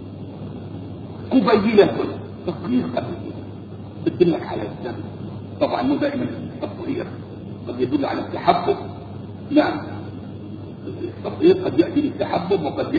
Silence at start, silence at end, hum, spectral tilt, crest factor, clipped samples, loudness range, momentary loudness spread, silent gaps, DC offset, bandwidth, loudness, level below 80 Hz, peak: 0 s; 0 s; none; -9 dB/octave; 22 dB; under 0.1%; 4 LU; 17 LU; none; under 0.1%; 6.8 kHz; -22 LUFS; -52 dBFS; 0 dBFS